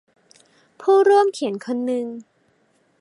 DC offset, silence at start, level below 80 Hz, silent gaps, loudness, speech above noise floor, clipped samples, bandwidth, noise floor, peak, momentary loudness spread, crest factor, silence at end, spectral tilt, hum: under 0.1%; 0.8 s; -82 dBFS; none; -19 LUFS; 44 dB; under 0.1%; 11 kHz; -63 dBFS; -4 dBFS; 15 LU; 16 dB; 0.8 s; -5 dB/octave; none